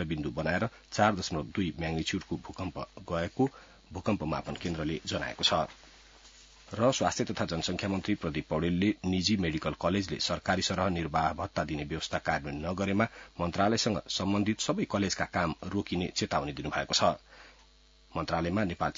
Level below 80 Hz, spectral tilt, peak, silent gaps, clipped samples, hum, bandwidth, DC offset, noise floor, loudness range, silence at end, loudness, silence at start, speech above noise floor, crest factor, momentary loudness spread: -54 dBFS; -4.5 dB/octave; -10 dBFS; none; under 0.1%; none; 7.8 kHz; under 0.1%; -60 dBFS; 3 LU; 0.05 s; -31 LUFS; 0 s; 29 dB; 22 dB; 8 LU